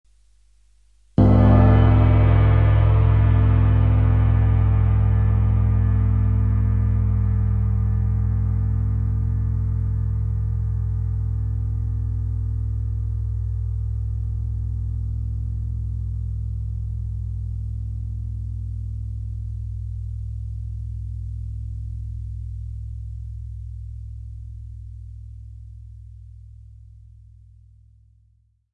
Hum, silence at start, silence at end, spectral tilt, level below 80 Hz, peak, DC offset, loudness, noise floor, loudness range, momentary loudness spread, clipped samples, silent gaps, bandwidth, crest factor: 50 Hz at -55 dBFS; 1.2 s; 2.1 s; -11 dB/octave; -26 dBFS; -4 dBFS; 0.1%; -22 LUFS; -61 dBFS; 18 LU; 19 LU; under 0.1%; none; 3.5 kHz; 18 dB